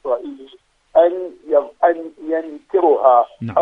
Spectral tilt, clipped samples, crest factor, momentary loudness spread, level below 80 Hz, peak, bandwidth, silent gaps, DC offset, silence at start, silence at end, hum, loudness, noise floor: -8.5 dB/octave; under 0.1%; 18 dB; 11 LU; -62 dBFS; 0 dBFS; 4 kHz; none; under 0.1%; 0.05 s; 0 s; none; -17 LUFS; -49 dBFS